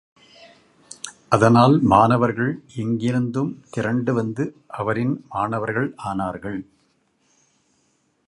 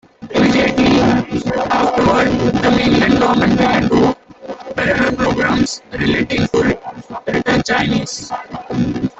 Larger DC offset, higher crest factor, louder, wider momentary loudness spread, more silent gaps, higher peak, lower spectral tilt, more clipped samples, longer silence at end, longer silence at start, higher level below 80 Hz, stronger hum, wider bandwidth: neither; first, 22 dB vs 14 dB; second, -21 LUFS vs -15 LUFS; first, 15 LU vs 12 LU; neither; about the same, 0 dBFS vs 0 dBFS; first, -7 dB/octave vs -5.5 dB/octave; neither; first, 1.65 s vs 0.1 s; first, 1.05 s vs 0.2 s; second, -52 dBFS vs -38 dBFS; neither; first, 11.5 kHz vs 8.2 kHz